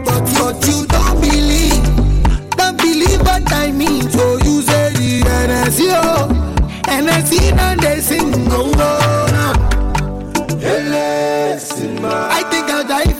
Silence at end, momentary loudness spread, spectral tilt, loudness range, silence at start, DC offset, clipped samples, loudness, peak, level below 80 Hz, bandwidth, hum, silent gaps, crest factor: 0 s; 6 LU; -4.5 dB/octave; 3 LU; 0 s; under 0.1%; under 0.1%; -14 LUFS; -2 dBFS; -18 dBFS; 17 kHz; none; none; 10 dB